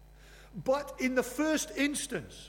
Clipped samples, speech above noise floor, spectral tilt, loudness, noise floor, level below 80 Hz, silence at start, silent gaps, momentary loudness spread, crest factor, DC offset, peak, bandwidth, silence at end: under 0.1%; 22 dB; -3.5 dB/octave; -32 LUFS; -54 dBFS; -56 dBFS; 0 s; none; 7 LU; 16 dB; under 0.1%; -18 dBFS; 18 kHz; 0 s